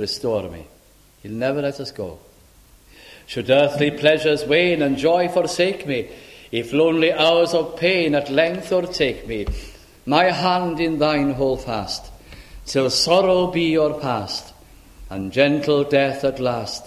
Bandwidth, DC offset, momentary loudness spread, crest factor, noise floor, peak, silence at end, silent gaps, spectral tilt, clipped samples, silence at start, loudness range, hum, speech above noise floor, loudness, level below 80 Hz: 15 kHz; under 0.1%; 14 LU; 20 dB; -52 dBFS; -2 dBFS; 0 s; none; -5 dB/octave; under 0.1%; 0 s; 3 LU; none; 32 dB; -19 LUFS; -44 dBFS